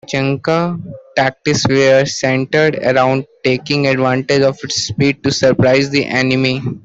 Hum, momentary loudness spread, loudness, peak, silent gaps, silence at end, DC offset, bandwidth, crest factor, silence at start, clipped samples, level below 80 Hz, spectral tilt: none; 6 LU; -14 LUFS; -2 dBFS; none; 0.05 s; under 0.1%; 8 kHz; 12 dB; 0.1 s; under 0.1%; -48 dBFS; -5 dB/octave